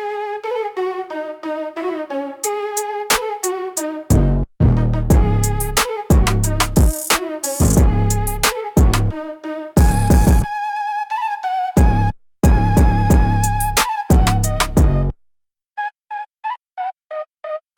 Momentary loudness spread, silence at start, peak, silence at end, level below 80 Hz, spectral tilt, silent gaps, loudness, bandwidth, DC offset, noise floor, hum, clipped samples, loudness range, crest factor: 13 LU; 0 s; -2 dBFS; 0.2 s; -20 dBFS; -5 dB/octave; none; -18 LUFS; 18 kHz; under 0.1%; -66 dBFS; none; under 0.1%; 6 LU; 14 dB